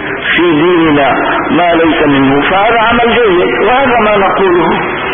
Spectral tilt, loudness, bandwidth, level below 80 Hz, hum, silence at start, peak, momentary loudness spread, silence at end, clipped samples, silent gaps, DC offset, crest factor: -10 dB/octave; -8 LUFS; 3.7 kHz; -34 dBFS; none; 0 s; 0 dBFS; 2 LU; 0 s; under 0.1%; none; under 0.1%; 8 dB